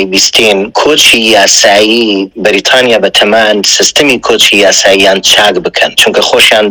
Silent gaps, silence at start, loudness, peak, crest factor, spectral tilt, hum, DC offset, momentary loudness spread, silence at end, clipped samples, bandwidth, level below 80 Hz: none; 0 s; -5 LUFS; 0 dBFS; 6 dB; -1 dB/octave; none; under 0.1%; 5 LU; 0 s; 9%; over 20 kHz; -42 dBFS